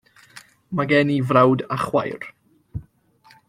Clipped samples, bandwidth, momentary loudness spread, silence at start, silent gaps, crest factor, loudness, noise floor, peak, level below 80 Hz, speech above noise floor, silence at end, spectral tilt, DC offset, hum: under 0.1%; 13.5 kHz; 21 LU; 0.35 s; none; 20 dB; -20 LUFS; -55 dBFS; -2 dBFS; -52 dBFS; 36 dB; 0.65 s; -7.5 dB/octave; under 0.1%; none